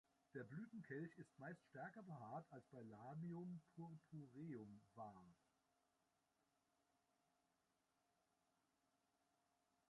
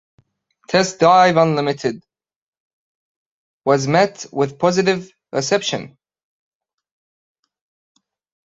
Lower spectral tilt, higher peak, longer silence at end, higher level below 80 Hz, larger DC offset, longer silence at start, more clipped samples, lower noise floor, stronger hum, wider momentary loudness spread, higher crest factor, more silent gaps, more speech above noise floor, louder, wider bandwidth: first, -8.5 dB/octave vs -4.5 dB/octave; second, -40 dBFS vs -2 dBFS; first, 4.55 s vs 2.55 s; second, under -90 dBFS vs -62 dBFS; neither; second, 0.35 s vs 0.7 s; neither; first, -88 dBFS vs -60 dBFS; neither; second, 7 LU vs 13 LU; about the same, 20 dB vs 20 dB; second, none vs 2.36-2.53 s, 2.60-3.60 s; second, 31 dB vs 44 dB; second, -58 LUFS vs -17 LUFS; first, 10 kHz vs 8 kHz